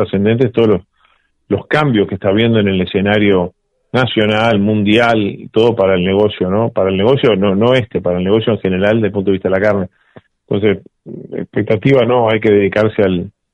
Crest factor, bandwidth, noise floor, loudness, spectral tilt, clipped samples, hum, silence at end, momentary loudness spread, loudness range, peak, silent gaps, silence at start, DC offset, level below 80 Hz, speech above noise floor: 12 dB; 8.6 kHz; -56 dBFS; -13 LUFS; -8 dB/octave; under 0.1%; none; 0.25 s; 8 LU; 3 LU; 0 dBFS; none; 0 s; under 0.1%; -48 dBFS; 43 dB